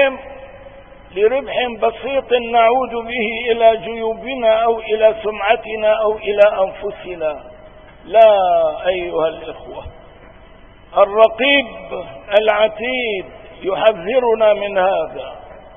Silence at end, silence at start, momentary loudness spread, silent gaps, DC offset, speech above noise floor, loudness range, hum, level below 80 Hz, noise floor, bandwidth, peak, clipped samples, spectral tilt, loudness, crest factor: 0.15 s; 0 s; 17 LU; none; 0.3%; 27 dB; 2 LU; none; -46 dBFS; -42 dBFS; 3.7 kHz; 0 dBFS; under 0.1%; -6.5 dB/octave; -16 LUFS; 16 dB